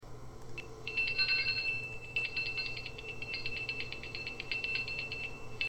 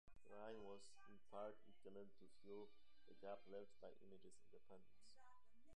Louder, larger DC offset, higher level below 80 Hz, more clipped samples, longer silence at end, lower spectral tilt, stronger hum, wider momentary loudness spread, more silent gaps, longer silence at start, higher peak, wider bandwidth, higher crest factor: first, -35 LUFS vs -61 LUFS; about the same, 0.2% vs 0.1%; first, -54 dBFS vs -84 dBFS; neither; about the same, 0 s vs 0 s; second, -3 dB/octave vs -5 dB/octave; neither; first, 14 LU vs 11 LU; neither; about the same, 0 s vs 0.05 s; first, -18 dBFS vs -42 dBFS; first, 16.5 kHz vs 9.6 kHz; about the same, 20 dB vs 20 dB